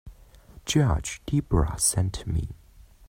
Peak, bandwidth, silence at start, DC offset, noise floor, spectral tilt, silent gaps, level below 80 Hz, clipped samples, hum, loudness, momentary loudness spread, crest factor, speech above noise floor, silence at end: -8 dBFS; 16 kHz; 0.05 s; under 0.1%; -50 dBFS; -4.5 dB/octave; none; -36 dBFS; under 0.1%; none; -26 LUFS; 8 LU; 18 dB; 25 dB; 0 s